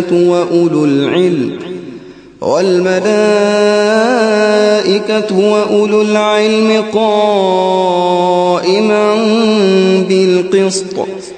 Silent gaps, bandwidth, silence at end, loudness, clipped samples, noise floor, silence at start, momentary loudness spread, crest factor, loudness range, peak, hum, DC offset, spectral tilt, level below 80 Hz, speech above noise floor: none; 9.6 kHz; 0 s; -11 LUFS; under 0.1%; -32 dBFS; 0 s; 5 LU; 10 dB; 2 LU; 0 dBFS; none; under 0.1%; -5 dB/octave; -56 dBFS; 22 dB